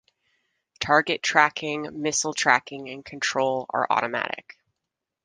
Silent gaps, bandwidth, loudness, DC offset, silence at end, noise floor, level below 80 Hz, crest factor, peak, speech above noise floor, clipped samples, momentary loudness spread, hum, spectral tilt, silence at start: none; 10.5 kHz; -23 LUFS; under 0.1%; 0.85 s; -84 dBFS; -64 dBFS; 24 dB; -2 dBFS; 60 dB; under 0.1%; 13 LU; none; -2 dB/octave; 0.8 s